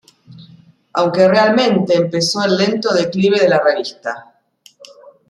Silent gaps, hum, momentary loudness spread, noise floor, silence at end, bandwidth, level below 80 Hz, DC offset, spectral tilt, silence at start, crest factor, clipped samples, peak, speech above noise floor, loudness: none; none; 12 LU; -50 dBFS; 1.05 s; 12 kHz; -62 dBFS; under 0.1%; -5 dB/octave; 0.3 s; 14 dB; under 0.1%; -2 dBFS; 35 dB; -14 LUFS